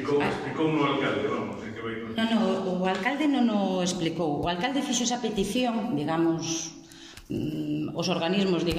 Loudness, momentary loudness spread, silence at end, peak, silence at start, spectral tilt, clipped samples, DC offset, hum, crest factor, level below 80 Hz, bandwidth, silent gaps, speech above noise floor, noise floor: -27 LUFS; 9 LU; 0 s; -12 dBFS; 0 s; -4.5 dB/octave; under 0.1%; under 0.1%; none; 14 dB; -56 dBFS; 15.5 kHz; none; 20 dB; -47 dBFS